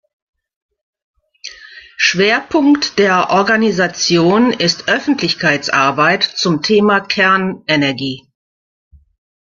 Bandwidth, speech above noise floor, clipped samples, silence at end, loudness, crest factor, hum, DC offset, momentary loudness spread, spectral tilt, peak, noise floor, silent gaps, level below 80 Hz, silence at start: 7.4 kHz; 24 dB; under 0.1%; 1.3 s; -13 LUFS; 14 dB; none; under 0.1%; 11 LU; -4 dB/octave; 0 dBFS; -38 dBFS; none; -54 dBFS; 1.45 s